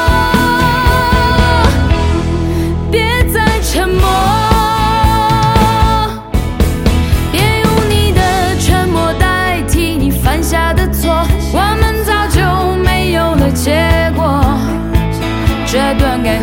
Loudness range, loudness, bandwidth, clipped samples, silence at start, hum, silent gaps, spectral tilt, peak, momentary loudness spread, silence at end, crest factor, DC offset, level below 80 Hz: 1 LU; -12 LUFS; 17 kHz; under 0.1%; 0 s; none; none; -5.5 dB/octave; 0 dBFS; 4 LU; 0 s; 10 dB; under 0.1%; -16 dBFS